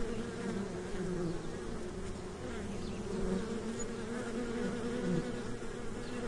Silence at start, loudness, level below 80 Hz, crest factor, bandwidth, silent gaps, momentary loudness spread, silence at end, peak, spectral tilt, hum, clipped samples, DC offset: 0 s; -39 LUFS; -48 dBFS; 16 dB; 11.5 kHz; none; 6 LU; 0 s; -22 dBFS; -6 dB/octave; none; under 0.1%; under 0.1%